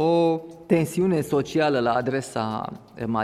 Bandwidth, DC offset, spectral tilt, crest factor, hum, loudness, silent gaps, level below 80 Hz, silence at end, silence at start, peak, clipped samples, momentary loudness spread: 15 kHz; under 0.1%; -6.5 dB/octave; 16 dB; none; -24 LUFS; none; -58 dBFS; 0 s; 0 s; -6 dBFS; under 0.1%; 9 LU